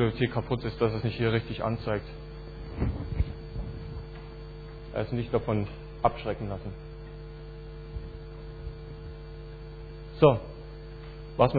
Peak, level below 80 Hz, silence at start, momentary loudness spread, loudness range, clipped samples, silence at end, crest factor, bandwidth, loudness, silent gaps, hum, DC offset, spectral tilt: -4 dBFS; -42 dBFS; 0 s; 17 LU; 10 LU; under 0.1%; 0 s; 26 dB; 4.9 kHz; -30 LUFS; none; none; under 0.1%; -10 dB/octave